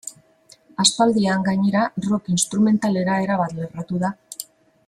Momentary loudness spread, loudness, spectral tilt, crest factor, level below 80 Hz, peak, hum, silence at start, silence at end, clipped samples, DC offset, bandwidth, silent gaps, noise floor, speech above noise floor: 17 LU; -20 LUFS; -4.5 dB/octave; 18 dB; -60 dBFS; -2 dBFS; none; 0.05 s; 0.45 s; under 0.1%; under 0.1%; 15 kHz; none; -53 dBFS; 34 dB